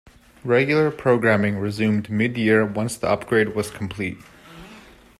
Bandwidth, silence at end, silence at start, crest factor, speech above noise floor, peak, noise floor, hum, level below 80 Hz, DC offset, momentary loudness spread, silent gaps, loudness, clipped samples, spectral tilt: 14 kHz; 0.4 s; 0.45 s; 16 dB; 26 dB; -6 dBFS; -46 dBFS; none; -54 dBFS; under 0.1%; 11 LU; none; -21 LUFS; under 0.1%; -6.5 dB/octave